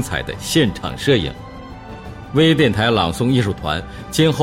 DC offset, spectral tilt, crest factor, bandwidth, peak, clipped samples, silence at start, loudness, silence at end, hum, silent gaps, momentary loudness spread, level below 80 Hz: under 0.1%; -5.5 dB/octave; 14 dB; 16.5 kHz; -4 dBFS; under 0.1%; 0 s; -18 LUFS; 0 s; none; none; 19 LU; -38 dBFS